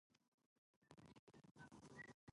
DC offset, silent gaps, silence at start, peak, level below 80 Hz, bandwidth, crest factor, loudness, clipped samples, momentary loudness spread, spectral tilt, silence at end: under 0.1%; 0.28-0.38 s, 0.46-0.82 s, 1.19-1.27 s, 1.51-1.55 s, 2.14-2.27 s; 0.1 s; -46 dBFS; -86 dBFS; 11 kHz; 20 dB; -64 LUFS; under 0.1%; 9 LU; -5 dB/octave; 0 s